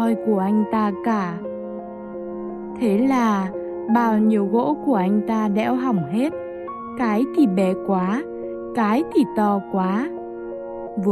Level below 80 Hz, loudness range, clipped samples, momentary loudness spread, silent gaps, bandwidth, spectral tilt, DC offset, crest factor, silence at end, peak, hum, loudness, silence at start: -58 dBFS; 3 LU; under 0.1%; 13 LU; none; 13.5 kHz; -8 dB/octave; under 0.1%; 14 dB; 0 s; -8 dBFS; none; -21 LUFS; 0 s